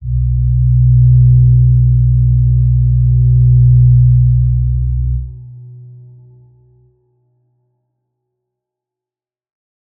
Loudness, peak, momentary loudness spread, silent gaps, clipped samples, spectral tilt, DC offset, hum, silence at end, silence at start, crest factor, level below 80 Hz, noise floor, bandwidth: -11 LUFS; -2 dBFS; 8 LU; none; under 0.1%; -20 dB/octave; under 0.1%; none; 4.2 s; 0 s; 10 dB; -18 dBFS; under -90 dBFS; 0.4 kHz